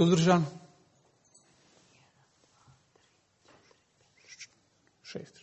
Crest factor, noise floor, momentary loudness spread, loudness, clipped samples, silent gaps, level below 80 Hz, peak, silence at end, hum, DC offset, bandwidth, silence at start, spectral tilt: 24 dB; -69 dBFS; 29 LU; -28 LUFS; under 0.1%; none; -72 dBFS; -10 dBFS; 0.2 s; none; under 0.1%; 8.4 kHz; 0 s; -6 dB/octave